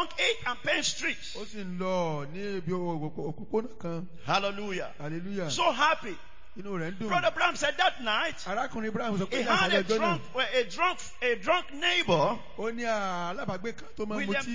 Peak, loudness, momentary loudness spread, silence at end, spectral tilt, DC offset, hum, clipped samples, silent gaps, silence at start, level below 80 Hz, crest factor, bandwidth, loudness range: -10 dBFS; -29 LUFS; 12 LU; 0 s; -4 dB/octave; 1%; none; under 0.1%; none; 0 s; -58 dBFS; 20 dB; 7.6 kHz; 6 LU